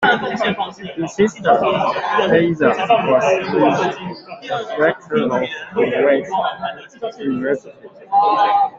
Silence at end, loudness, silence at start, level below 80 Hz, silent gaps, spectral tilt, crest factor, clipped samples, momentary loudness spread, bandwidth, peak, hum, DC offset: 0 s; -17 LUFS; 0 s; -58 dBFS; none; -5.5 dB/octave; 16 dB; under 0.1%; 11 LU; 7.8 kHz; -2 dBFS; none; under 0.1%